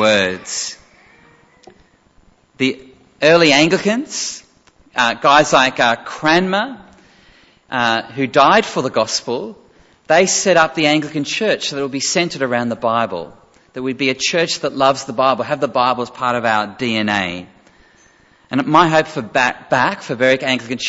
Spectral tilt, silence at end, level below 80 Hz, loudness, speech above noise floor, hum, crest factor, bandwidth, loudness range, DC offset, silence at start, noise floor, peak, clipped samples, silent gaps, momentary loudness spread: -3.5 dB/octave; 0 s; -56 dBFS; -16 LUFS; 36 dB; none; 18 dB; 8.2 kHz; 4 LU; under 0.1%; 0 s; -52 dBFS; 0 dBFS; under 0.1%; none; 12 LU